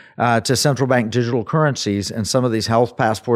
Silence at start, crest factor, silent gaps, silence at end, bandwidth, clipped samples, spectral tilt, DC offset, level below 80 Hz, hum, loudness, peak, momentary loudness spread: 0.2 s; 16 dB; none; 0 s; 15 kHz; under 0.1%; -5 dB/octave; under 0.1%; -56 dBFS; none; -18 LUFS; -2 dBFS; 4 LU